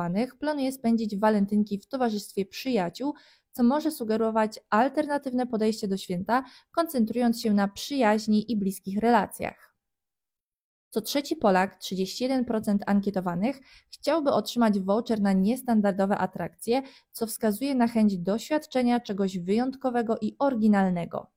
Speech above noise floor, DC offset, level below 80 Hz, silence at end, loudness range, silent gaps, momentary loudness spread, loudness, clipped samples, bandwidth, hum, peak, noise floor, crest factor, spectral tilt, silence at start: over 64 dB; under 0.1%; -62 dBFS; 0.15 s; 2 LU; 10.43-10.91 s; 8 LU; -27 LUFS; under 0.1%; 16.5 kHz; none; -10 dBFS; under -90 dBFS; 18 dB; -6 dB/octave; 0 s